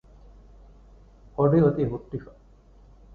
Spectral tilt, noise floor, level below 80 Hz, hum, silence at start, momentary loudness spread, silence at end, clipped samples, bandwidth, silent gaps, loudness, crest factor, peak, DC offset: -11.5 dB/octave; -53 dBFS; -50 dBFS; none; 1.4 s; 18 LU; 0.9 s; under 0.1%; 4.5 kHz; none; -23 LUFS; 20 dB; -8 dBFS; under 0.1%